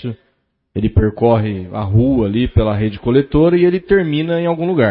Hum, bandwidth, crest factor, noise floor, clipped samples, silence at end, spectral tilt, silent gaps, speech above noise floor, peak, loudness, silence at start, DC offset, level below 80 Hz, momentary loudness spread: none; 4.8 kHz; 14 dB; -64 dBFS; under 0.1%; 0 s; -13 dB/octave; none; 50 dB; 0 dBFS; -15 LUFS; 0 s; under 0.1%; -30 dBFS; 9 LU